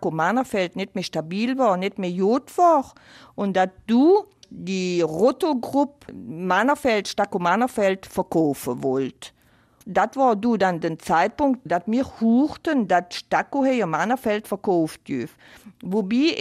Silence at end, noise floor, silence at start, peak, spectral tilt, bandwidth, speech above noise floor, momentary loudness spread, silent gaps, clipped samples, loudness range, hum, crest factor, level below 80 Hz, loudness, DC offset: 0 s; -57 dBFS; 0 s; -8 dBFS; -5.5 dB/octave; 15 kHz; 35 dB; 10 LU; none; under 0.1%; 2 LU; none; 14 dB; -58 dBFS; -22 LUFS; under 0.1%